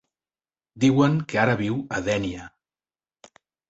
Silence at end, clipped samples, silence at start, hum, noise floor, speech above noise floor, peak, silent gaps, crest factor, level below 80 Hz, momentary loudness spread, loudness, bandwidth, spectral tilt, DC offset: 1.2 s; under 0.1%; 0.75 s; none; under -90 dBFS; over 68 dB; -4 dBFS; none; 22 dB; -54 dBFS; 9 LU; -23 LUFS; 8 kHz; -6.5 dB/octave; under 0.1%